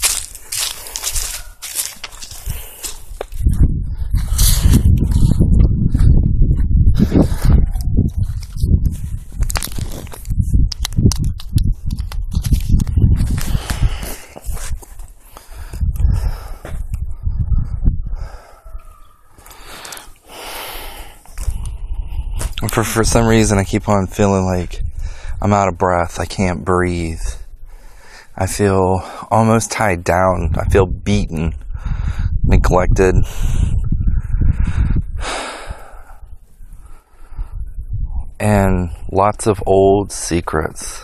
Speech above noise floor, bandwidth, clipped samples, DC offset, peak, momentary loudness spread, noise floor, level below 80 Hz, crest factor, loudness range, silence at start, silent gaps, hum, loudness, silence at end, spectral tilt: 27 dB; 14.5 kHz; under 0.1%; under 0.1%; 0 dBFS; 16 LU; -41 dBFS; -20 dBFS; 16 dB; 11 LU; 0 s; none; none; -18 LUFS; 0 s; -5.5 dB/octave